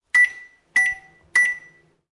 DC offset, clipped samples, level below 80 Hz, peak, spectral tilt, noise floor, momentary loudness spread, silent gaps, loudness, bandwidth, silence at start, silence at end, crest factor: under 0.1%; under 0.1%; -64 dBFS; -6 dBFS; 1 dB/octave; -52 dBFS; 12 LU; none; -19 LUFS; 11.5 kHz; 0.15 s; 0.55 s; 16 dB